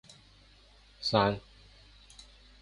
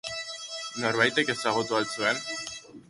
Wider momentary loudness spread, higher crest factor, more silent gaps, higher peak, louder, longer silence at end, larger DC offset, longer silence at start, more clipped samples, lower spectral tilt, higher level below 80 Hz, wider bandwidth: first, 25 LU vs 12 LU; about the same, 26 dB vs 22 dB; neither; second, -10 dBFS vs -6 dBFS; second, -30 LUFS vs -27 LUFS; first, 1.25 s vs 0.1 s; neither; first, 1 s vs 0.05 s; neither; first, -5.5 dB/octave vs -2.5 dB/octave; first, -58 dBFS vs -68 dBFS; about the same, 11.5 kHz vs 11.5 kHz